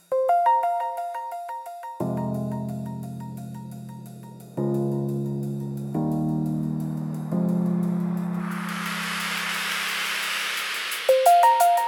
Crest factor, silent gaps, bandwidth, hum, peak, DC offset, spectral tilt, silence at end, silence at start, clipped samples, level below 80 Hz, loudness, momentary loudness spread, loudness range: 20 dB; none; 18 kHz; none; -6 dBFS; under 0.1%; -5 dB/octave; 0 s; 0.1 s; under 0.1%; -64 dBFS; -25 LUFS; 16 LU; 8 LU